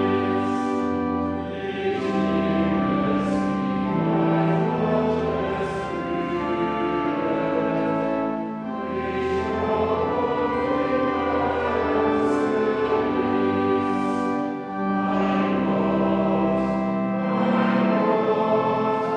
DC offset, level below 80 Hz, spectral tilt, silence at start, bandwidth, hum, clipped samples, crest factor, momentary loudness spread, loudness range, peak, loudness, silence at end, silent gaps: under 0.1%; -48 dBFS; -8 dB/octave; 0 s; 9.4 kHz; none; under 0.1%; 14 dB; 5 LU; 3 LU; -10 dBFS; -23 LUFS; 0 s; none